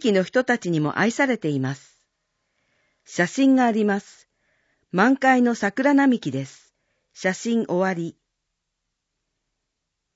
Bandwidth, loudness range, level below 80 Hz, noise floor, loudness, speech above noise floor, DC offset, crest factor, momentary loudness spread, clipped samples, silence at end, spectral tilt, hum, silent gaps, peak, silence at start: 8 kHz; 8 LU; -72 dBFS; -80 dBFS; -21 LUFS; 59 dB; under 0.1%; 18 dB; 12 LU; under 0.1%; 2.05 s; -5.5 dB/octave; none; none; -6 dBFS; 0 s